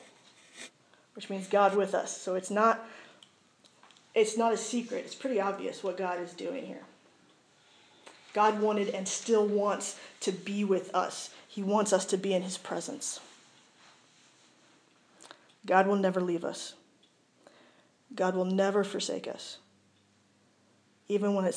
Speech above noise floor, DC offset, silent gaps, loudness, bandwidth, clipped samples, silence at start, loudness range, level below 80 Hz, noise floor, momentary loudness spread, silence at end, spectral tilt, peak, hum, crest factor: 37 dB; under 0.1%; none; -31 LUFS; 11 kHz; under 0.1%; 0 s; 5 LU; under -90 dBFS; -67 dBFS; 17 LU; 0 s; -4.5 dB/octave; -10 dBFS; none; 22 dB